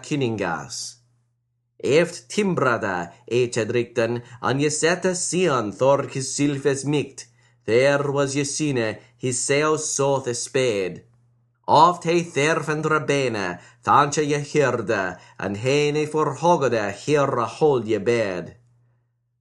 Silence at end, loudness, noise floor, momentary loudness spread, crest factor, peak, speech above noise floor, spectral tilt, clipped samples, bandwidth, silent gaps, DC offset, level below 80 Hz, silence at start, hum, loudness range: 0.85 s; -22 LUFS; -72 dBFS; 10 LU; 22 dB; 0 dBFS; 50 dB; -4.5 dB/octave; under 0.1%; 12 kHz; none; under 0.1%; -62 dBFS; 0 s; none; 3 LU